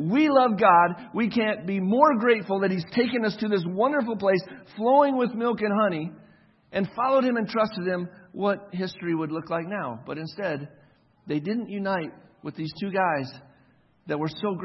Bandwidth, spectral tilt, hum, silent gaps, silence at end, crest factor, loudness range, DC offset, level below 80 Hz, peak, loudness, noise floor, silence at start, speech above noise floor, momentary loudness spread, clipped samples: 6 kHz; -8.5 dB/octave; none; none; 0 s; 22 dB; 8 LU; under 0.1%; -68 dBFS; -4 dBFS; -25 LUFS; -61 dBFS; 0 s; 36 dB; 14 LU; under 0.1%